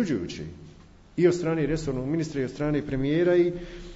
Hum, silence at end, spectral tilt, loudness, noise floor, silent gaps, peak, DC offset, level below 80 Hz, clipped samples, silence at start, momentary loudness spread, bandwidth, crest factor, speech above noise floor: none; 0 s; -7 dB/octave; -26 LUFS; -50 dBFS; none; -10 dBFS; under 0.1%; -46 dBFS; under 0.1%; 0 s; 15 LU; 8 kHz; 16 dB; 25 dB